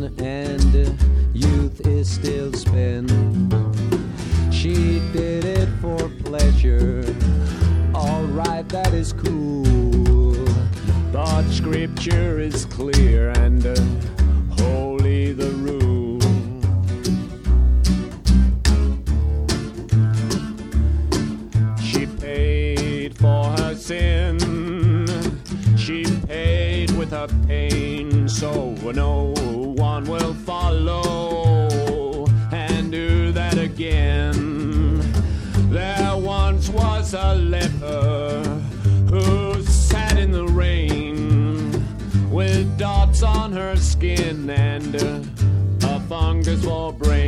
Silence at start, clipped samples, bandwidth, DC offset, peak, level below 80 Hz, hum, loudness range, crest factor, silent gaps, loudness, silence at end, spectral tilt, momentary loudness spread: 0 s; under 0.1%; 12 kHz; under 0.1%; -2 dBFS; -22 dBFS; none; 2 LU; 16 dB; none; -20 LUFS; 0 s; -6.5 dB/octave; 6 LU